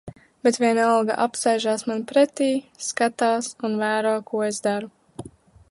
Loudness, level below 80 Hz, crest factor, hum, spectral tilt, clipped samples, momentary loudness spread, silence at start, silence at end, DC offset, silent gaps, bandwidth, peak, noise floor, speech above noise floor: -22 LUFS; -64 dBFS; 16 dB; none; -3.5 dB/octave; under 0.1%; 10 LU; 0.05 s; 0.45 s; under 0.1%; none; 11.5 kHz; -6 dBFS; -44 dBFS; 22 dB